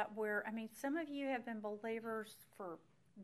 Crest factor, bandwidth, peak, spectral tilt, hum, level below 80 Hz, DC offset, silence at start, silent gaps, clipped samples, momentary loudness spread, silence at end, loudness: 18 dB; 14 kHz; -26 dBFS; -5 dB/octave; none; -88 dBFS; under 0.1%; 0 s; none; under 0.1%; 11 LU; 0 s; -44 LUFS